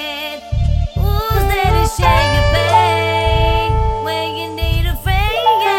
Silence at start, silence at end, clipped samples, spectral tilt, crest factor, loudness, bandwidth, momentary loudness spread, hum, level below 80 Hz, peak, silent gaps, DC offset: 0 s; 0 s; under 0.1%; -5 dB/octave; 14 dB; -15 LUFS; 17 kHz; 8 LU; none; -20 dBFS; 0 dBFS; none; under 0.1%